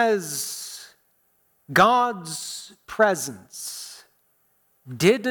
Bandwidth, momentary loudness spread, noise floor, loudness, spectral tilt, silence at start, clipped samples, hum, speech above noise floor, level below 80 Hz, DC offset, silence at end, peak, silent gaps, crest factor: 19 kHz; 19 LU; -66 dBFS; -23 LUFS; -3.5 dB/octave; 0 s; under 0.1%; none; 43 dB; -66 dBFS; under 0.1%; 0 s; -6 dBFS; none; 20 dB